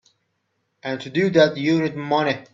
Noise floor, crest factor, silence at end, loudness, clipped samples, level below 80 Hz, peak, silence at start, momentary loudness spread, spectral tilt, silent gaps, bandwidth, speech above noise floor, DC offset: -73 dBFS; 20 dB; 0.1 s; -20 LUFS; under 0.1%; -64 dBFS; -2 dBFS; 0.85 s; 13 LU; -6.5 dB/octave; none; 7.6 kHz; 52 dB; under 0.1%